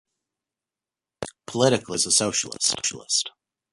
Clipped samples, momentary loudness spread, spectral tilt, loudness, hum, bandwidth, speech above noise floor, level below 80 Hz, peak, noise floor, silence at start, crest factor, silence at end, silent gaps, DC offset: under 0.1%; 16 LU; -2 dB/octave; -22 LUFS; none; 11.5 kHz; 66 dB; -62 dBFS; -6 dBFS; -90 dBFS; 1.2 s; 22 dB; 0.45 s; none; under 0.1%